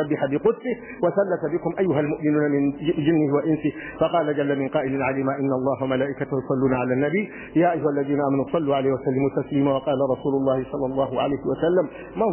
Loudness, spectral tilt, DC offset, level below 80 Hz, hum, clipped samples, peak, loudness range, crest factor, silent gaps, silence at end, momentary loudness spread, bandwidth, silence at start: -23 LUFS; -11.5 dB/octave; under 0.1%; -54 dBFS; none; under 0.1%; -6 dBFS; 1 LU; 16 dB; none; 0 s; 4 LU; 3.2 kHz; 0 s